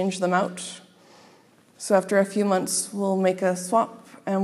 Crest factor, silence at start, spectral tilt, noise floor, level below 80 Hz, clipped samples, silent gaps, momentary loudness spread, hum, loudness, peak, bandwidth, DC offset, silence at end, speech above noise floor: 18 dB; 0 s; -4.5 dB/octave; -56 dBFS; -80 dBFS; under 0.1%; none; 15 LU; none; -24 LUFS; -6 dBFS; 15 kHz; under 0.1%; 0 s; 33 dB